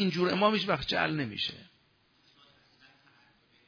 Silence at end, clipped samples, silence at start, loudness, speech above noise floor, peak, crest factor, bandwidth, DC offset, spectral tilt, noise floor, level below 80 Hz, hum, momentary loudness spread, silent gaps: 2.05 s; under 0.1%; 0 s; -29 LUFS; 38 dB; -12 dBFS; 20 dB; 5.4 kHz; under 0.1%; -6 dB/octave; -68 dBFS; -60 dBFS; none; 8 LU; none